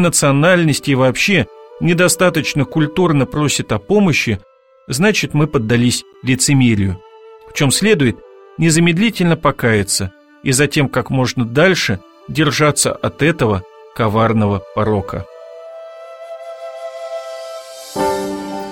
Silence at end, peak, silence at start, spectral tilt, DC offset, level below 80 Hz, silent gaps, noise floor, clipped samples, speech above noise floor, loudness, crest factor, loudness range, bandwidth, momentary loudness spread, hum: 0 s; 0 dBFS; 0 s; -4.5 dB/octave; under 0.1%; -44 dBFS; none; -39 dBFS; under 0.1%; 25 dB; -15 LUFS; 16 dB; 6 LU; 16.5 kHz; 17 LU; none